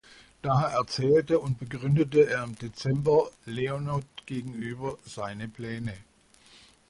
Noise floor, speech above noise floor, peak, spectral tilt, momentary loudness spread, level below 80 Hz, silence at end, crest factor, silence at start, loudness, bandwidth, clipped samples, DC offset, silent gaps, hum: -58 dBFS; 31 dB; -10 dBFS; -7 dB/octave; 14 LU; -58 dBFS; 0.9 s; 18 dB; 0.45 s; -28 LUFS; 11.5 kHz; under 0.1%; under 0.1%; none; none